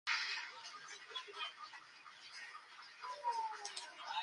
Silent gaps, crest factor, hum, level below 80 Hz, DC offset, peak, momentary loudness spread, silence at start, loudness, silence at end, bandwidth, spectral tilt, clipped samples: none; 22 dB; none; under -90 dBFS; under 0.1%; -24 dBFS; 14 LU; 0.05 s; -45 LUFS; 0 s; 11.5 kHz; 2 dB/octave; under 0.1%